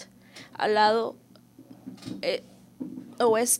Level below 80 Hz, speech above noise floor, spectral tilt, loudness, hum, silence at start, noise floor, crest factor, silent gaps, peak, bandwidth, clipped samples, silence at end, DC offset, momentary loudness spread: -74 dBFS; 27 dB; -2 dB/octave; -26 LUFS; none; 0 s; -52 dBFS; 20 dB; none; -10 dBFS; 16 kHz; under 0.1%; 0 s; under 0.1%; 24 LU